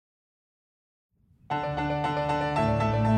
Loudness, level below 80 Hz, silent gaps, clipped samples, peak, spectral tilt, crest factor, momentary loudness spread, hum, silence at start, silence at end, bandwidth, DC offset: -28 LUFS; -48 dBFS; none; under 0.1%; -12 dBFS; -7.5 dB/octave; 16 dB; 6 LU; none; 1.5 s; 0 s; 9 kHz; under 0.1%